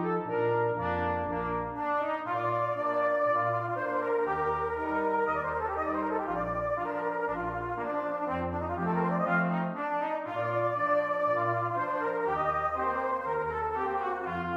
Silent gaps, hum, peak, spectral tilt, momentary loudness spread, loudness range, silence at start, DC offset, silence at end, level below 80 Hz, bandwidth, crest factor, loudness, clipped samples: none; none; -16 dBFS; -8.5 dB/octave; 5 LU; 2 LU; 0 s; under 0.1%; 0 s; -54 dBFS; 7.6 kHz; 14 dB; -30 LUFS; under 0.1%